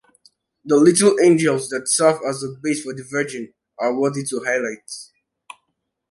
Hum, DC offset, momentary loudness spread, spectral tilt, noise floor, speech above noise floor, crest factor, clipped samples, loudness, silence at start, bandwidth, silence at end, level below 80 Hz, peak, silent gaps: none; under 0.1%; 17 LU; -4 dB/octave; -75 dBFS; 56 dB; 18 dB; under 0.1%; -19 LUFS; 0.65 s; 11.5 kHz; 1.05 s; -66 dBFS; -2 dBFS; none